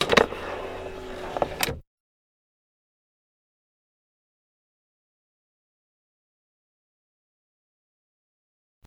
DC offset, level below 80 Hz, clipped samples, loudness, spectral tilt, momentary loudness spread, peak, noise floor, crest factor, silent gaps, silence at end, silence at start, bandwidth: under 0.1%; -52 dBFS; under 0.1%; -28 LUFS; -3.5 dB/octave; 16 LU; 0 dBFS; under -90 dBFS; 32 dB; none; 7.05 s; 0 s; 19 kHz